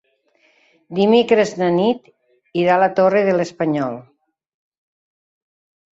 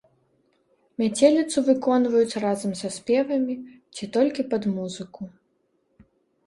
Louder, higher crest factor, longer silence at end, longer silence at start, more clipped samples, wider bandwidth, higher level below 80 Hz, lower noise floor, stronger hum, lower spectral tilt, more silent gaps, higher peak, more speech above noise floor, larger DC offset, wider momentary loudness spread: first, -17 LUFS vs -23 LUFS; about the same, 18 dB vs 20 dB; first, 1.95 s vs 1.2 s; about the same, 0.9 s vs 1 s; neither; second, 8 kHz vs 11.5 kHz; about the same, -64 dBFS vs -66 dBFS; second, -60 dBFS vs -70 dBFS; neither; about the same, -6 dB/octave vs -5 dB/octave; neither; about the same, -2 dBFS vs -4 dBFS; about the same, 44 dB vs 47 dB; neither; second, 13 LU vs 18 LU